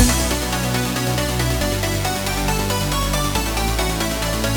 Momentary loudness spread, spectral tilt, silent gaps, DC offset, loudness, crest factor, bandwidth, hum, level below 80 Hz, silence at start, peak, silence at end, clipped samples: 1 LU; -4 dB/octave; none; under 0.1%; -20 LUFS; 18 dB; over 20 kHz; none; -26 dBFS; 0 s; -2 dBFS; 0 s; under 0.1%